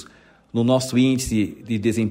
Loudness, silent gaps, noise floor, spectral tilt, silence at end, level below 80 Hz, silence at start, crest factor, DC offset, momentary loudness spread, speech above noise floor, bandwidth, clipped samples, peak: -21 LUFS; none; -51 dBFS; -5.5 dB/octave; 0 s; -46 dBFS; 0 s; 14 dB; under 0.1%; 6 LU; 31 dB; 16 kHz; under 0.1%; -6 dBFS